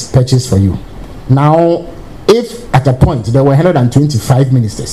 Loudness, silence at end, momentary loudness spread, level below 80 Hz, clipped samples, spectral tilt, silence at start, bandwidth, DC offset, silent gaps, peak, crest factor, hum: -11 LUFS; 0 s; 9 LU; -28 dBFS; 0.3%; -7 dB/octave; 0 s; 13 kHz; 0.9%; none; 0 dBFS; 10 dB; none